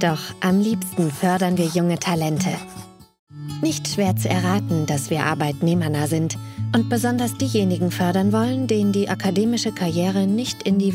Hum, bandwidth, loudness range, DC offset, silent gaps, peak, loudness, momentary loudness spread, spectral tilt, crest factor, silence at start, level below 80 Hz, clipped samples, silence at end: none; 16 kHz; 2 LU; under 0.1%; 3.19-3.27 s; -4 dBFS; -21 LUFS; 4 LU; -5.5 dB/octave; 16 dB; 0 s; -58 dBFS; under 0.1%; 0 s